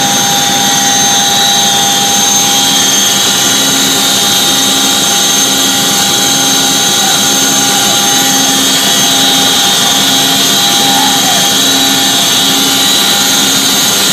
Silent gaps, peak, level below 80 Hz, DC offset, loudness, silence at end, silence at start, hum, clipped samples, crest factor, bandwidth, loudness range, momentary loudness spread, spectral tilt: none; 0 dBFS; -48 dBFS; under 0.1%; -6 LUFS; 0 s; 0 s; none; 0.3%; 8 dB; over 20 kHz; 1 LU; 1 LU; -0.5 dB/octave